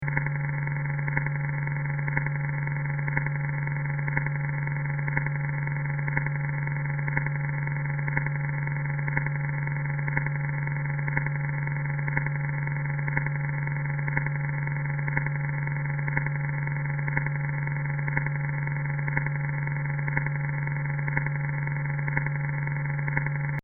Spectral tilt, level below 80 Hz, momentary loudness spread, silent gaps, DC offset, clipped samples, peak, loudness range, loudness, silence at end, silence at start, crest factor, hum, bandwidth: -5 dB/octave; -48 dBFS; 1 LU; none; under 0.1%; under 0.1%; -6 dBFS; 0 LU; -28 LUFS; 0.05 s; 0 s; 22 dB; none; 2.4 kHz